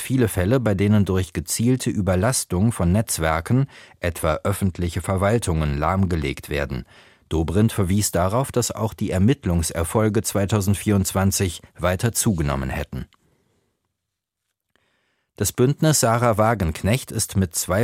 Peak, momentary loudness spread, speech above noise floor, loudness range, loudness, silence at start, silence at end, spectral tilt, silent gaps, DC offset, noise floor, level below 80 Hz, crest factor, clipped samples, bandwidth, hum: -4 dBFS; 7 LU; 61 dB; 5 LU; -21 LUFS; 0 s; 0 s; -5.5 dB/octave; none; under 0.1%; -81 dBFS; -38 dBFS; 18 dB; under 0.1%; 16.5 kHz; none